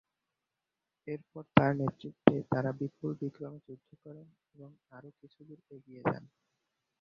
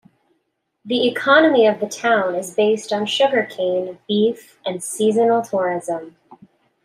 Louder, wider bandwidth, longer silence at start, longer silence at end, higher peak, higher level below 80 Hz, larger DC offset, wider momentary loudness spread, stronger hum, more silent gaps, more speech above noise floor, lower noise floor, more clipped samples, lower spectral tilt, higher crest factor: second, -32 LUFS vs -18 LUFS; second, 6.2 kHz vs 15 kHz; first, 1.05 s vs 0.85 s; about the same, 0.8 s vs 0.75 s; about the same, -2 dBFS vs -2 dBFS; first, -66 dBFS vs -72 dBFS; neither; first, 26 LU vs 11 LU; neither; neither; about the same, 54 dB vs 53 dB; first, -89 dBFS vs -71 dBFS; neither; first, -6.5 dB/octave vs -4 dB/octave; first, 34 dB vs 18 dB